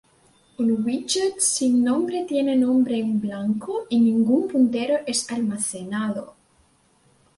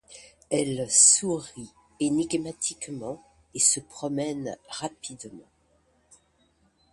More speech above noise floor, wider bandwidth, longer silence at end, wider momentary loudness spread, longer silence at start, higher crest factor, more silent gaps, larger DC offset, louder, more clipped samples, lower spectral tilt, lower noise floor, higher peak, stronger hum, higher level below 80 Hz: about the same, 39 dB vs 40 dB; about the same, 11.5 kHz vs 11.5 kHz; second, 1.05 s vs 1.5 s; second, 8 LU vs 23 LU; first, 0.6 s vs 0.1 s; second, 16 dB vs 24 dB; neither; neither; about the same, -22 LUFS vs -24 LUFS; neither; first, -4 dB/octave vs -2.5 dB/octave; second, -61 dBFS vs -66 dBFS; second, -8 dBFS vs -4 dBFS; neither; about the same, -64 dBFS vs -64 dBFS